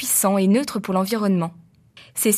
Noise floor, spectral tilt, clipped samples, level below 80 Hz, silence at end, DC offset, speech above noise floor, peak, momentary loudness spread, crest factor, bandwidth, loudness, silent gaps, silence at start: -50 dBFS; -4.5 dB/octave; under 0.1%; -66 dBFS; 0 s; under 0.1%; 30 dB; -4 dBFS; 9 LU; 16 dB; 15.5 kHz; -20 LUFS; none; 0 s